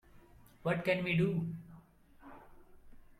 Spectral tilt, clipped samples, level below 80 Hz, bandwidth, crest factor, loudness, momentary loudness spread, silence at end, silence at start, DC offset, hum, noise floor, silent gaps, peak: -7.5 dB/octave; under 0.1%; -62 dBFS; 13 kHz; 20 dB; -34 LUFS; 25 LU; 0.15 s; 0.15 s; under 0.1%; none; -60 dBFS; none; -18 dBFS